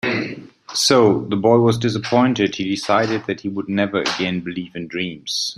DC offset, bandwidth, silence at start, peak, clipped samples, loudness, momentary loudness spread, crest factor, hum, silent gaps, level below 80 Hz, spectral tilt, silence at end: under 0.1%; 14.5 kHz; 0.05 s; -2 dBFS; under 0.1%; -19 LUFS; 11 LU; 18 dB; none; none; -58 dBFS; -4.5 dB/octave; 0.05 s